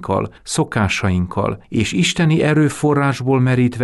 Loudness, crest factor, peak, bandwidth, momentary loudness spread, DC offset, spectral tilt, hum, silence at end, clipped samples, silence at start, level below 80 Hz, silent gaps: -17 LUFS; 10 dB; -6 dBFS; 12 kHz; 7 LU; under 0.1%; -5.5 dB/octave; none; 0 s; under 0.1%; 0 s; -42 dBFS; none